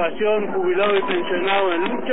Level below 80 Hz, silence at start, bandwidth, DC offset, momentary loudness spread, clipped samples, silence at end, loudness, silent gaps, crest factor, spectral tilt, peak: -58 dBFS; 0 s; 4 kHz; 4%; 3 LU; under 0.1%; 0 s; -20 LUFS; none; 12 dB; -8.5 dB/octave; -8 dBFS